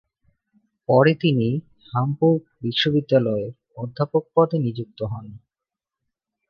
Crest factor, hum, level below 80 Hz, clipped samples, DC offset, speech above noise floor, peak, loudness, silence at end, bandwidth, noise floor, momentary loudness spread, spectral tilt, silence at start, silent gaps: 20 dB; none; -58 dBFS; under 0.1%; under 0.1%; 67 dB; -2 dBFS; -21 LUFS; 1.15 s; 6.6 kHz; -88 dBFS; 14 LU; -8.5 dB/octave; 0.9 s; none